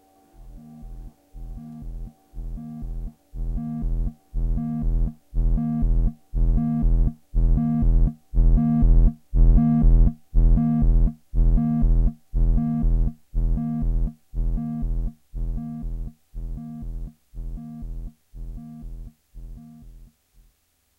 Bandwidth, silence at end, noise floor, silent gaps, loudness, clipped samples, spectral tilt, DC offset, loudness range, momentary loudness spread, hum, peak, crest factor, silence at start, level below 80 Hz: 1.7 kHz; 1 s; -66 dBFS; none; -25 LUFS; under 0.1%; -11.5 dB/octave; under 0.1%; 18 LU; 21 LU; none; -8 dBFS; 14 dB; 0.4 s; -22 dBFS